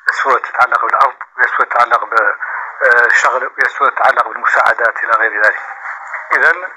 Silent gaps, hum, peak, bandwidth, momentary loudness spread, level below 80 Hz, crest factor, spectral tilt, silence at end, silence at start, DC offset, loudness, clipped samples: none; none; 0 dBFS; 14 kHz; 9 LU; -64 dBFS; 14 dB; -1 dB/octave; 0 s; 0.05 s; under 0.1%; -12 LUFS; under 0.1%